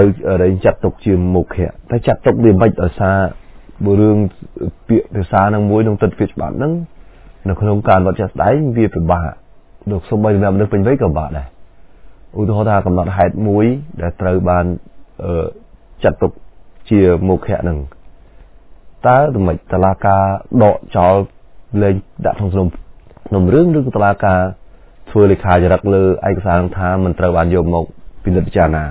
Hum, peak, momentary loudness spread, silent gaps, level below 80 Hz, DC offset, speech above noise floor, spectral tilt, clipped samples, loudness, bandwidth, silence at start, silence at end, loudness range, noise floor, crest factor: none; 0 dBFS; 10 LU; none; -28 dBFS; under 0.1%; 27 dB; -12.5 dB/octave; under 0.1%; -14 LUFS; 4 kHz; 0 s; 0 s; 3 LU; -40 dBFS; 14 dB